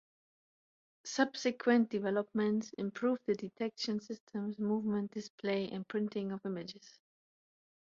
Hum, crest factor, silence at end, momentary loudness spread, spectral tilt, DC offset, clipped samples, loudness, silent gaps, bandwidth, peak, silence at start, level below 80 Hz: none; 20 dB; 0.95 s; 11 LU; -4.5 dB/octave; under 0.1%; under 0.1%; -36 LUFS; 4.20-4.27 s, 5.30-5.38 s; 7.6 kHz; -16 dBFS; 1.05 s; -80 dBFS